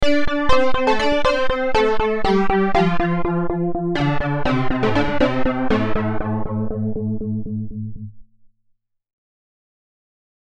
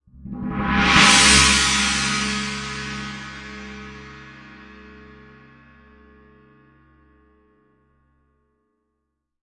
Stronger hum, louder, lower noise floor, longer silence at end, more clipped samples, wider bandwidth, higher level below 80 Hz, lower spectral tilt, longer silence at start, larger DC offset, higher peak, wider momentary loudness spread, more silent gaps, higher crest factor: neither; second, -20 LUFS vs -16 LUFS; second, -65 dBFS vs -77 dBFS; second, 1.35 s vs 4.8 s; neither; second, 8.6 kHz vs 11.5 kHz; first, -32 dBFS vs -38 dBFS; first, -7 dB/octave vs -1.5 dB/octave; second, 0 s vs 0.25 s; neither; about the same, -2 dBFS vs 0 dBFS; second, 8 LU vs 26 LU; neither; second, 16 dB vs 22 dB